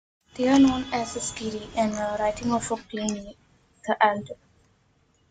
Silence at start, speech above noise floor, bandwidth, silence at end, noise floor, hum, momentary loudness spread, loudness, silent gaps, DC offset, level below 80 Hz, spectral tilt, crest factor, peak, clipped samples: 0.35 s; 40 dB; 9.4 kHz; 0.95 s; -65 dBFS; none; 18 LU; -25 LUFS; none; under 0.1%; -54 dBFS; -4 dB/octave; 22 dB; -4 dBFS; under 0.1%